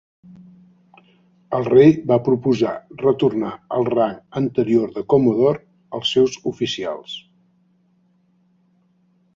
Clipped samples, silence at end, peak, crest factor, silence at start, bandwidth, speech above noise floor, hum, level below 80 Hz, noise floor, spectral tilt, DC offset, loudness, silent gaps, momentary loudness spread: under 0.1%; 2.15 s; -2 dBFS; 18 dB; 1.5 s; 7.6 kHz; 43 dB; none; -58 dBFS; -61 dBFS; -6.5 dB/octave; under 0.1%; -19 LUFS; none; 13 LU